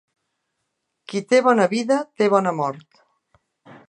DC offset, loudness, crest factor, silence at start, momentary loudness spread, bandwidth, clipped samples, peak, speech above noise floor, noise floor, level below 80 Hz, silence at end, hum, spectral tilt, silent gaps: under 0.1%; -20 LUFS; 20 dB; 1.1 s; 13 LU; 9.8 kHz; under 0.1%; -2 dBFS; 57 dB; -77 dBFS; -74 dBFS; 0.15 s; none; -5.5 dB/octave; none